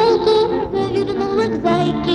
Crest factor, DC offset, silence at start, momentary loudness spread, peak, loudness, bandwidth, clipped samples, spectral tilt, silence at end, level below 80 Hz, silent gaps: 12 dB; under 0.1%; 0 s; 5 LU; -4 dBFS; -17 LUFS; 10 kHz; under 0.1%; -6.5 dB/octave; 0 s; -42 dBFS; none